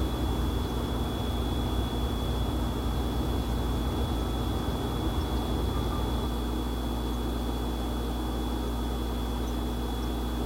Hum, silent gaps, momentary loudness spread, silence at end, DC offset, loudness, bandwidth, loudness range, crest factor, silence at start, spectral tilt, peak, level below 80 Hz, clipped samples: 60 Hz at -40 dBFS; none; 2 LU; 0 s; under 0.1%; -31 LUFS; 16 kHz; 2 LU; 12 dB; 0 s; -6 dB/octave; -16 dBFS; -32 dBFS; under 0.1%